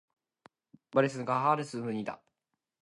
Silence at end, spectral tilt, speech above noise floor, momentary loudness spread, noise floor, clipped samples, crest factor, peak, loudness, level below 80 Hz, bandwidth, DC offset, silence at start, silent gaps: 0.65 s; -6.5 dB/octave; 56 dB; 11 LU; -86 dBFS; under 0.1%; 22 dB; -12 dBFS; -31 LUFS; -78 dBFS; 11.5 kHz; under 0.1%; 0.95 s; none